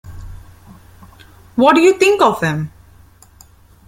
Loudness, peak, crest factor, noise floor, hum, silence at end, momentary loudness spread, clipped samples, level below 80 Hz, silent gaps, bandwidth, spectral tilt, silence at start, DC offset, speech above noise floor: -13 LUFS; -2 dBFS; 16 dB; -46 dBFS; none; 1.2 s; 22 LU; under 0.1%; -44 dBFS; none; 16 kHz; -5 dB/octave; 0.05 s; under 0.1%; 34 dB